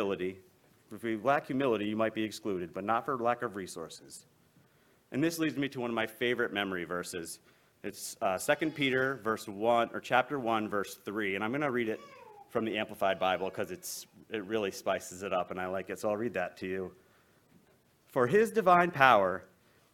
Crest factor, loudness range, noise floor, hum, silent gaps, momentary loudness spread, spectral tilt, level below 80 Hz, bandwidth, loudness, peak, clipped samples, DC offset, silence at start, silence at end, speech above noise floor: 26 dB; 5 LU; -67 dBFS; none; none; 14 LU; -4.5 dB/octave; -72 dBFS; 17.5 kHz; -32 LUFS; -6 dBFS; under 0.1%; under 0.1%; 0 s; 0.5 s; 35 dB